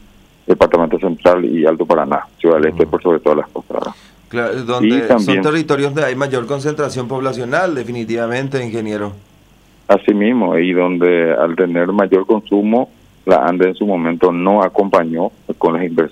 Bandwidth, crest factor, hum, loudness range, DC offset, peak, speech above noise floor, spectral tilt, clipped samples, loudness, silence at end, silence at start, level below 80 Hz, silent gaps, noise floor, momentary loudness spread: 11.5 kHz; 14 dB; none; 4 LU; under 0.1%; 0 dBFS; 34 dB; -6.5 dB/octave; under 0.1%; -15 LUFS; 0 s; 0.5 s; -50 dBFS; none; -48 dBFS; 9 LU